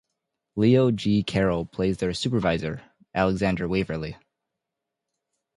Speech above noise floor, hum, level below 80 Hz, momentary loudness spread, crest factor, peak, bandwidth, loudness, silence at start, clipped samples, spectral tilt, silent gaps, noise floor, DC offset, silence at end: 61 dB; none; -48 dBFS; 12 LU; 20 dB; -6 dBFS; 11.5 kHz; -24 LUFS; 0.55 s; under 0.1%; -7 dB/octave; none; -85 dBFS; under 0.1%; 1.4 s